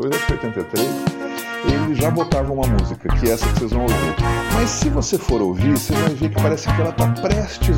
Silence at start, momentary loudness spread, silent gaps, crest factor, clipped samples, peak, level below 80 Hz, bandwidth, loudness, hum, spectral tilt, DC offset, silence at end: 0 s; 4 LU; none; 14 dB; under 0.1%; -4 dBFS; -26 dBFS; 17 kHz; -19 LUFS; none; -5.5 dB/octave; under 0.1%; 0 s